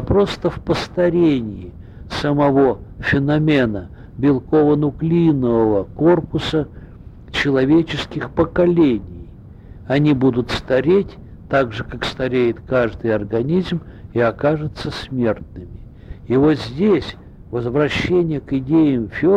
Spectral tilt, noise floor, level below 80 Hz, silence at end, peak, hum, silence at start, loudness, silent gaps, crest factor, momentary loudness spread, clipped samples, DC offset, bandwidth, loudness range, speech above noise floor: -7.5 dB/octave; -38 dBFS; -38 dBFS; 0 s; -4 dBFS; none; 0 s; -18 LUFS; none; 14 dB; 12 LU; under 0.1%; under 0.1%; 9.6 kHz; 4 LU; 21 dB